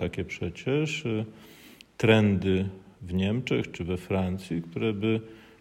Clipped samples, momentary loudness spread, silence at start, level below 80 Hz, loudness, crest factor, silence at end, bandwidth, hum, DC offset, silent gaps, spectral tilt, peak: under 0.1%; 12 LU; 0 s; -54 dBFS; -28 LUFS; 20 dB; 0.2 s; 15.5 kHz; none; under 0.1%; none; -7 dB/octave; -8 dBFS